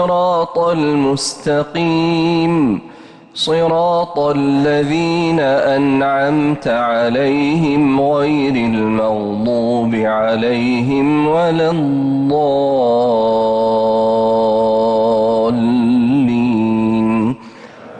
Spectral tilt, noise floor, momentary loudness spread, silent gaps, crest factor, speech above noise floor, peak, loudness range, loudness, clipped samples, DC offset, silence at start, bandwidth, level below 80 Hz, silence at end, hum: -6.5 dB/octave; -36 dBFS; 3 LU; none; 8 dB; 22 dB; -6 dBFS; 2 LU; -15 LUFS; under 0.1%; under 0.1%; 0 s; 11 kHz; -48 dBFS; 0 s; none